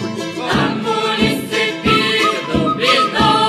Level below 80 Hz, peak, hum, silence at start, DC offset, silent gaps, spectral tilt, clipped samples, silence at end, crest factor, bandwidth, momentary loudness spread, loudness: -40 dBFS; 0 dBFS; none; 0 s; under 0.1%; none; -4.5 dB/octave; under 0.1%; 0 s; 16 dB; 14 kHz; 5 LU; -15 LUFS